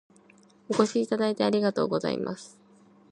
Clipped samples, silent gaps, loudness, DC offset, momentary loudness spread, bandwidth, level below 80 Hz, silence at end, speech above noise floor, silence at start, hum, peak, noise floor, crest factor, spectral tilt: under 0.1%; none; -27 LUFS; under 0.1%; 8 LU; 11 kHz; -72 dBFS; 0.65 s; 32 dB; 0.7 s; none; -6 dBFS; -58 dBFS; 22 dB; -5.5 dB/octave